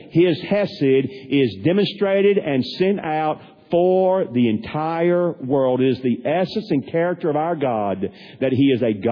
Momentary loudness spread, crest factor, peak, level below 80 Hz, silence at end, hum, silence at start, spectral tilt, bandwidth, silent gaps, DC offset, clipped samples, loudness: 6 LU; 12 dB; -6 dBFS; -60 dBFS; 0 s; none; 0 s; -9 dB/octave; 5.4 kHz; none; under 0.1%; under 0.1%; -20 LUFS